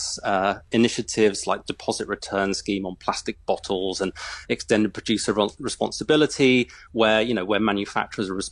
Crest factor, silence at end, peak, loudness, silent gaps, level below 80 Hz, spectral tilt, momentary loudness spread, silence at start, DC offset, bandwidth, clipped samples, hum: 18 dB; 0 s; -6 dBFS; -23 LUFS; none; -52 dBFS; -4 dB/octave; 9 LU; 0 s; under 0.1%; 11.5 kHz; under 0.1%; none